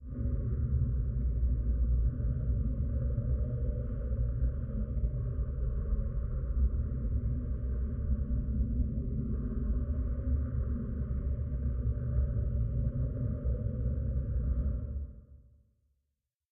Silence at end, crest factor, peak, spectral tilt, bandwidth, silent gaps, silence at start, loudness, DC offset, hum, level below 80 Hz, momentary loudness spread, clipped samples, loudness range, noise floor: 1.1 s; 12 dB; -18 dBFS; -12.5 dB/octave; 1.8 kHz; none; 0 s; -34 LUFS; under 0.1%; none; -34 dBFS; 4 LU; under 0.1%; 2 LU; -85 dBFS